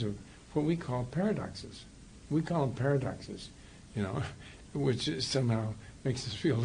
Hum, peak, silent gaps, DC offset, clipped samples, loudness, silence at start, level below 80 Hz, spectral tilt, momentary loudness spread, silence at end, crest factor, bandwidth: none; -18 dBFS; none; under 0.1%; under 0.1%; -34 LUFS; 0 s; -56 dBFS; -6 dB/octave; 17 LU; 0 s; 16 dB; 10 kHz